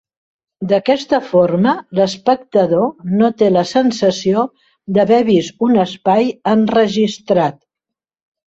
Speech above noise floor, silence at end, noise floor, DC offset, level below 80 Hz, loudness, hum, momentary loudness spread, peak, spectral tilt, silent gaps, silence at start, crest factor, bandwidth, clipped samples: 70 dB; 0.95 s; -84 dBFS; under 0.1%; -56 dBFS; -15 LUFS; none; 5 LU; -2 dBFS; -6.5 dB/octave; none; 0.6 s; 14 dB; 8 kHz; under 0.1%